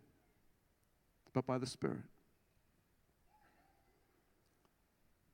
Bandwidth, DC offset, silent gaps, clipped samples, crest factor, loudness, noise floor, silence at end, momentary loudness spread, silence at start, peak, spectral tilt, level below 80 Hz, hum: 17 kHz; under 0.1%; none; under 0.1%; 28 dB; -42 LUFS; -77 dBFS; 3.25 s; 5 LU; 1.35 s; -22 dBFS; -6 dB/octave; -80 dBFS; none